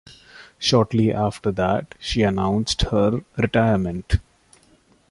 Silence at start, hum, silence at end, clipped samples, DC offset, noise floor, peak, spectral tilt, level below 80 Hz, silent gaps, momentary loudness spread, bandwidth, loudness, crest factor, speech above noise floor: 0.1 s; none; 0.9 s; under 0.1%; under 0.1%; -57 dBFS; -4 dBFS; -6 dB/octave; -36 dBFS; none; 7 LU; 11.5 kHz; -21 LUFS; 18 dB; 37 dB